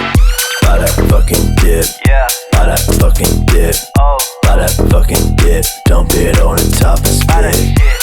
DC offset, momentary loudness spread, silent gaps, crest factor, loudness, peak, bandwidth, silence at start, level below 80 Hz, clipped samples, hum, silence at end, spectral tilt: under 0.1%; 2 LU; none; 8 dB; -11 LUFS; 0 dBFS; 19.5 kHz; 0 s; -10 dBFS; under 0.1%; none; 0 s; -4.5 dB/octave